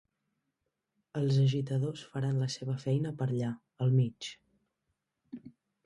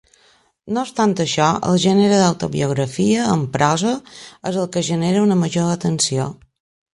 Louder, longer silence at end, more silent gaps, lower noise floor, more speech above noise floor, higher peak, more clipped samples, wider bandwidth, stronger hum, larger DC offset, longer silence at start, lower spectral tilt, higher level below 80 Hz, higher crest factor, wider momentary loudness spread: second, -32 LUFS vs -18 LUFS; second, 0.35 s vs 0.6 s; neither; first, -84 dBFS vs -56 dBFS; first, 53 dB vs 39 dB; second, -16 dBFS vs 0 dBFS; neither; about the same, 11 kHz vs 11.5 kHz; neither; neither; first, 1.15 s vs 0.65 s; first, -7 dB/octave vs -5 dB/octave; second, -70 dBFS vs -54 dBFS; about the same, 16 dB vs 18 dB; first, 17 LU vs 10 LU